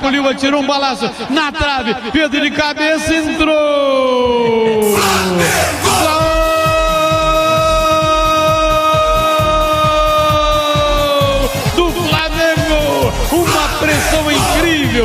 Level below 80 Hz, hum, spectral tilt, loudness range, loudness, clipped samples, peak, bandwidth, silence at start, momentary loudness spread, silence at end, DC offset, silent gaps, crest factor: -26 dBFS; none; -4 dB/octave; 2 LU; -13 LUFS; under 0.1%; 0 dBFS; 15.5 kHz; 0 s; 3 LU; 0 s; under 0.1%; none; 12 dB